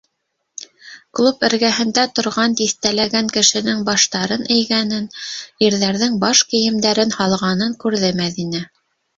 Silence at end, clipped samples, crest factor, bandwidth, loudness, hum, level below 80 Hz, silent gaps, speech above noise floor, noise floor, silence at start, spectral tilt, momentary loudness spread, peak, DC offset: 0.5 s; under 0.1%; 18 dB; 7.8 kHz; -16 LUFS; none; -56 dBFS; none; 56 dB; -73 dBFS; 0.6 s; -3 dB/octave; 14 LU; 0 dBFS; under 0.1%